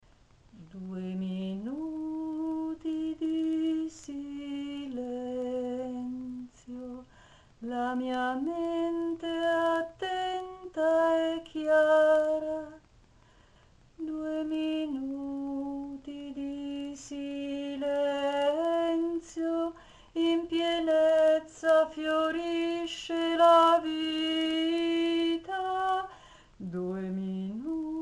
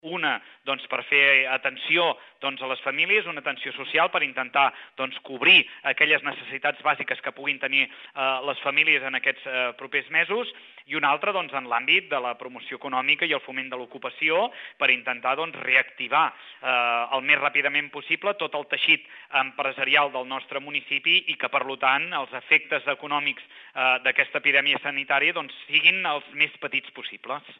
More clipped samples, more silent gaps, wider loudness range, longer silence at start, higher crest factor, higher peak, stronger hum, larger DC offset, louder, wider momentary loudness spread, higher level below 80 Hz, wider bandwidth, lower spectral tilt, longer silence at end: neither; neither; first, 10 LU vs 3 LU; first, 0.55 s vs 0.05 s; about the same, 18 dB vs 22 dB; second, -12 dBFS vs -4 dBFS; neither; neither; second, -30 LUFS vs -23 LUFS; first, 15 LU vs 12 LU; first, -64 dBFS vs -84 dBFS; first, 11.5 kHz vs 6.2 kHz; about the same, -5.5 dB/octave vs -5 dB/octave; about the same, 0 s vs 0.05 s